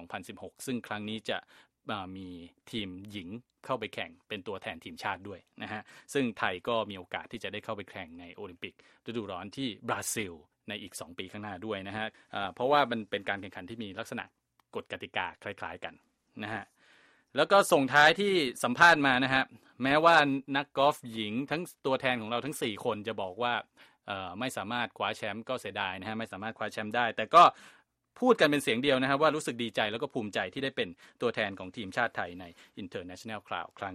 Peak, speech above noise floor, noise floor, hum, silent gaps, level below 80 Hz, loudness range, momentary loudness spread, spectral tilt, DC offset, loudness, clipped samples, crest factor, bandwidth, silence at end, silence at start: -8 dBFS; 32 dB; -63 dBFS; none; none; -70 dBFS; 14 LU; 19 LU; -4 dB/octave; under 0.1%; -30 LUFS; under 0.1%; 24 dB; 15 kHz; 0 s; 0 s